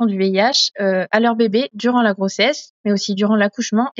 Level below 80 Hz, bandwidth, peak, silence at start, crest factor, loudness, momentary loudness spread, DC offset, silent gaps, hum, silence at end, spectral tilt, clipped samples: -78 dBFS; 7.8 kHz; -2 dBFS; 0 s; 16 dB; -17 LUFS; 5 LU; under 0.1%; 2.70-2.84 s; none; 0.1 s; -3 dB/octave; under 0.1%